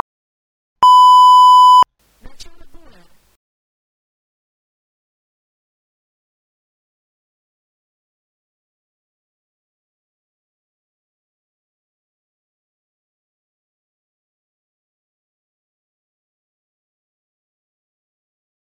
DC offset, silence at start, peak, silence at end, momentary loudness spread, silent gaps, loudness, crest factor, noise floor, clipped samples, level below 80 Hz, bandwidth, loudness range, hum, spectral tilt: under 0.1%; 0.8 s; -2 dBFS; 16.95 s; 10 LU; none; -7 LUFS; 18 dB; -45 dBFS; under 0.1%; -56 dBFS; 16 kHz; 7 LU; none; 0 dB/octave